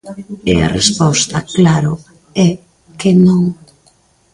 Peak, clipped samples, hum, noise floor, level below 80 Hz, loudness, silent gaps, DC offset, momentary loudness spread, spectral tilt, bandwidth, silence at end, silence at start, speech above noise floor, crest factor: 0 dBFS; under 0.1%; none; -52 dBFS; -38 dBFS; -13 LUFS; none; under 0.1%; 15 LU; -5 dB/octave; 11.5 kHz; 0.8 s; 0.05 s; 40 dB; 14 dB